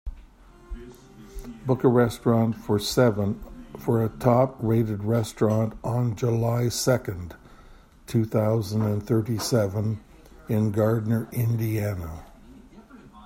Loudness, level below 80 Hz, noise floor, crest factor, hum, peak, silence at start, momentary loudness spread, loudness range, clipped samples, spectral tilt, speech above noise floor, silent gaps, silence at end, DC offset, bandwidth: -25 LUFS; -46 dBFS; -50 dBFS; 20 dB; none; -4 dBFS; 0.05 s; 18 LU; 3 LU; under 0.1%; -6.5 dB/octave; 27 dB; none; 0 s; under 0.1%; 16.5 kHz